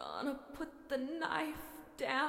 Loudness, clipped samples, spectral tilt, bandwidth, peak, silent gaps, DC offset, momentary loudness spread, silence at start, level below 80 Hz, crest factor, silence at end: -41 LUFS; under 0.1%; -3.5 dB/octave; 16.5 kHz; -20 dBFS; none; under 0.1%; 10 LU; 0 s; -66 dBFS; 20 dB; 0 s